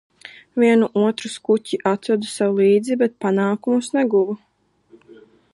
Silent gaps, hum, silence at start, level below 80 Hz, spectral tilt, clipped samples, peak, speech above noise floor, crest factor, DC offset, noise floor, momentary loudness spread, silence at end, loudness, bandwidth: none; none; 0.25 s; -70 dBFS; -6 dB/octave; under 0.1%; -4 dBFS; 36 dB; 16 dB; under 0.1%; -54 dBFS; 7 LU; 1.15 s; -19 LUFS; 11.5 kHz